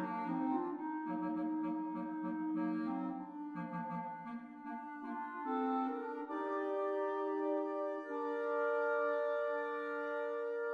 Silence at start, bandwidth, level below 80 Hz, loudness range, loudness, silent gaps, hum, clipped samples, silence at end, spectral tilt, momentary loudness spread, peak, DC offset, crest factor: 0 s; 6.2 kHz; -88 dBFS; 5 LU; -39 LUFS; none; none; under 0.1%; 0 s; -8.5 dB/octave; 9 LU; -24 dBFS; under 0.1%; 14 dB